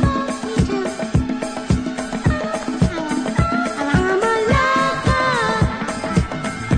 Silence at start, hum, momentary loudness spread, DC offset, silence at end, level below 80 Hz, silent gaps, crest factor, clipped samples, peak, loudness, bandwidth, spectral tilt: 0 s; none; 7 LU; under 0.1%; 0 s; -30 dBFS; none; 16 dB; under 0.1%; -4 dBFS; -19 LUFS; 10.5 kHz; -6 dB/octave